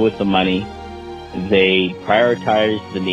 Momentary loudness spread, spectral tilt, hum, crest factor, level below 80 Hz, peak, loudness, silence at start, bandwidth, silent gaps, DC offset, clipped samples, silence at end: 17 LU; -6.5 dB/octave; none; 16 dB; -44 dBFS; -2 dBFS; -17 LUFS; 0 s; 8.4 kHz; none; under 0.1%; under 0.1%; 0 s